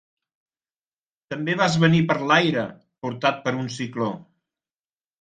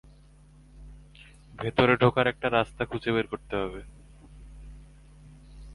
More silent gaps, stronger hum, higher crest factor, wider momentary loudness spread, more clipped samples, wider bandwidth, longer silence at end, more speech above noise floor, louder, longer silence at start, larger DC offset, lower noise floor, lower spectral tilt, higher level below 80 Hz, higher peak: neither; neither; about the same, 22 dB vs 24 dB; second, 15 LU vs 27 LU; neither; second, 9.2 kHz vs 11.5 kHz; first, 0.95 s vs 0 s; first, over 68 dB vs 28 dB; first, -22 LUFS vs -26 LUFS; first, 1.3 s vs 0.75 s; neither; first, under -90 dBFS vs -54 dBFS; second, -5.5 dB/octave vs -7 dB/octave; second, -62 dBFS vs -50 dBFS; first, -2 dBFS vs -6 dBFS